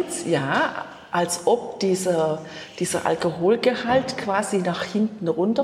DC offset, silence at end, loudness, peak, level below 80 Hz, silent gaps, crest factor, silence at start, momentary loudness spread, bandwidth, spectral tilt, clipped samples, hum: under 0.1%; 0 s; -23 LUFS; -6 dBFS; -62 dBFS; none; 16 dB; 0 s; 5 LU; 14.5 kHz; -4.5 dB/octave; under 0.1%; none